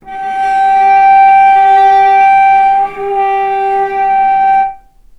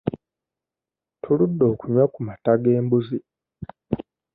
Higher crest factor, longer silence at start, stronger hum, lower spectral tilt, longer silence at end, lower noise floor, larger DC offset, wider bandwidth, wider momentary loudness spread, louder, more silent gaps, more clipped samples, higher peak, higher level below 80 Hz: second, 8 dB vs 18 dB; about the same, 0.05 s vs 0.05 s; neither; second, -3.5 dB/octave vs -13 dB/octave; about the same, 0.4 s vs 0.35 s; second, -30 dBFS vs -89 dBFS; neither; first, 6.2 kHz vs 4.5 kHz; second, 8 LU vs 21 LU; first, -8 LUFS vs -22 LUFS; neither; neither; first, 0 dBFS vs -4 dBFS; first, -44 dBFS vs -54 dBFS